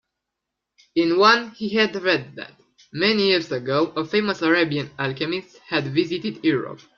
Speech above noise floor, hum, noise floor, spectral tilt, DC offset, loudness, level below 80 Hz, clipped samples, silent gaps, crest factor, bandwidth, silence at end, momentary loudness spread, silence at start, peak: 61 dB; none; -83 dBFS; -5.5 dB/octave; under 0.1%; -21 LUFS; -64 dBFS; under 0.1%; none; 20 dB; 7.2 kHz; 0.2 s; 11 LU; 0.95 s; -2 dBFS